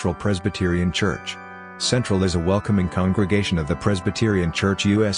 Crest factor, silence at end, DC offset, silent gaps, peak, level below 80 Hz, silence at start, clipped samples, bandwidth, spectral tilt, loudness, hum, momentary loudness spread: 16 dB; 0 s; under 0.1%; none; -6 dBFS; -44 dBFS; 0 s; under 0.1%; 10.5 kHz; -5.5 dB/octave; -21 LUFS; none; 5 LU